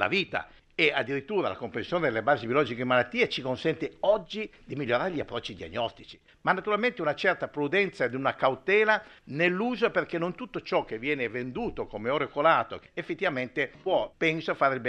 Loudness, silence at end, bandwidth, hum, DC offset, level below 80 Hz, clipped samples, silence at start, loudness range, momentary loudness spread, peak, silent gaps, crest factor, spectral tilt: -28 LUFS; 0 s; 9.4 kHz; none; under 0.1%; -58 dBFS; under 0.1%; 0 s; 3 LU; 11 LU; -6 dBFS; none; 22 dB; -6 dB/octave